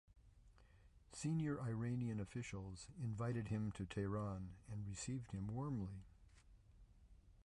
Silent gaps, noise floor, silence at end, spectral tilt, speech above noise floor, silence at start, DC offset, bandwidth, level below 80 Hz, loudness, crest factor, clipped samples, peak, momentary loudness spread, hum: none; -68 dBFS; 0 s; -6.5 dB/octave; 23 dB; 0.15 s; under 0.1%; 11 kHz; -64 dBFS; -46 LUFS; 14 dB; under 0.1%; -32 dBFS; 9 LU; none